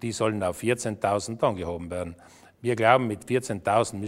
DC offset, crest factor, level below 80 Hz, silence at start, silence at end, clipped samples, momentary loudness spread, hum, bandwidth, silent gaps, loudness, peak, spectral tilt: under 0.1%; 22 dB; -56 dBFS; 0 s; 0 s; under 0.1%; 12 LU; none; 16 kHz; none; -26 LUFS; -4 dBFS; -5 dB/octave